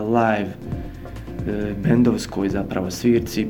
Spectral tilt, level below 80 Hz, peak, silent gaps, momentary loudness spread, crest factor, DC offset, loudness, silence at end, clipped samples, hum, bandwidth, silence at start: -6.5 dB/octave; -40 dBFS; -4 dBFS; none; 14 LU; 18 dB; 0.2%; -22 LUFS; 0 s; under 0.1%; none; 17.5 kHz; 0 s